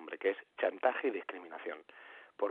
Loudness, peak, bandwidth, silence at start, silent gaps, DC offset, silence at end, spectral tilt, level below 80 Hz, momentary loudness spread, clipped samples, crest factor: -37 LUFS; -16 dBFS; 4.4 kHz; 0 s; none; under 0.1%; 0 s; -5.5 dB/octave; under -90 dBFS; 20 LU; under 0.1%; 22 dB